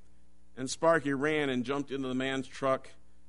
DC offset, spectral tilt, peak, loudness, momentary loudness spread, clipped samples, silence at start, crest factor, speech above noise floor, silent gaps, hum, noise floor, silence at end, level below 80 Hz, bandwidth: 0.5%; -4.5 dB/octave; -12 dBFS; -31 LUFS; 8 LU; under 0.1%; 0.55 s; 20 dB; 33 dB; none; none; -64 dBFS; 0.35 s; -64 dBFS; 10.5 kHz